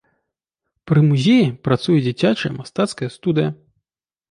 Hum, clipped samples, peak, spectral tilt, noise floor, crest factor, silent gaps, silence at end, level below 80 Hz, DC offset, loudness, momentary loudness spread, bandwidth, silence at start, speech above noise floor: none; under 0.1%; -2 dBFS; -7 dB/octave; -84 dBFS; 16 dB; none; 0.8 s; -56 dBFS; under 0.1%; -18 LUFS; 9 LU; 11 kHz; 0.85 s; 67 dB